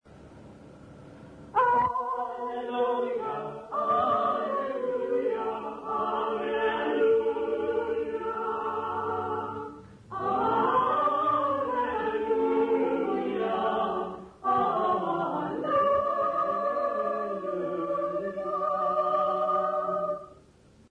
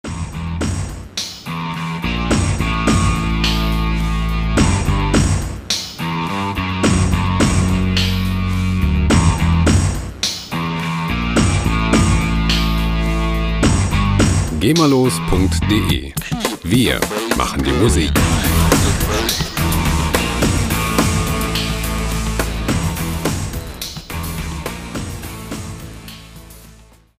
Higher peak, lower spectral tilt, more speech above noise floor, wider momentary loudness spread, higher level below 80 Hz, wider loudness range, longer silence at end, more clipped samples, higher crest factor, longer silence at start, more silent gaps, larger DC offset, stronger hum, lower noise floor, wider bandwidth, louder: second, -14 dBFS vs 0 dBFS; first, -7 dB/octave vs -5 dB/octave; about the same, 28 dB vs 30 dB; about the same, 9 LU vs 11 LU; second, -62 dBFS vs -24 dBFS; second, 3 LU vs 6 LU; about the same, 0.55 s vs 0.45 s; neither; about the same, 14 dB vs 16 dB; about the same, 0.05 s vs 0.05 s; neither; neither; neither; first, -57 dBFS vs -45 dBFS; second, 9.6 kHz vs 16 kHz; second, -28 LUFS vs -17 LUFS